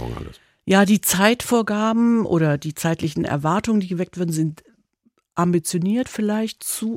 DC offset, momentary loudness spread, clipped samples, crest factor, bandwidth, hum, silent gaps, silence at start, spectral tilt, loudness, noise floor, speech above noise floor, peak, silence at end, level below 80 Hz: under 0.1%; 10 LU; under 0.1%; 18 dB; 16.5 kHz; none; none; 0 s; -5 dB/octave; -20 LUFS; -65 dBFS; 45 dB; -2 dBFS; 0 s; -50 dBFS